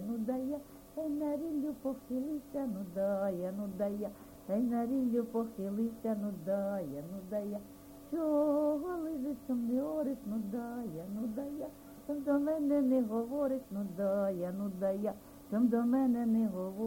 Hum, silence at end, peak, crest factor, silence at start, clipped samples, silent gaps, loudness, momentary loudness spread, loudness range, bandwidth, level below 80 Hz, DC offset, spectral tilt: none; 0 s; -20 dBFS; 14 dB; 0 s; under 0.1%; none; -35 LUFS; 11 LU; 4 LU; 17 kHz; -66 dBFS; under 0.1%; -8 dB/octave